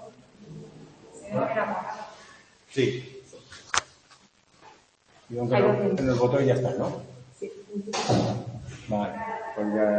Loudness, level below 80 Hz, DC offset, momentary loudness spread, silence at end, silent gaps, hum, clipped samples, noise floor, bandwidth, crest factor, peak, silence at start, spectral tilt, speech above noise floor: -27 LUFS; -58 dBFS; under 0.1%; 23 LU; 0 s; none; none; under 0.1%; -59 dBFS; 8.8 kHz; 26 dB; -2 dBFS; 0 s; -5.5 dB/octave; 34 dB